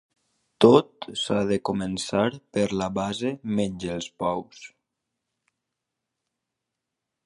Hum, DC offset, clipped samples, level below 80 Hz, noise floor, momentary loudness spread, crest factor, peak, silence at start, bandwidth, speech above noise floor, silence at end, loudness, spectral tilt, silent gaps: none; under 0.1%; under 0.1%; -58 dBFS; -84 dBFS; 14 LU; 26 dB; -2 dBFS; 0.6 s; 11.5 kHz; 60 dB; 2.6 s; -25 LUFS; -5.5 dB/octave; none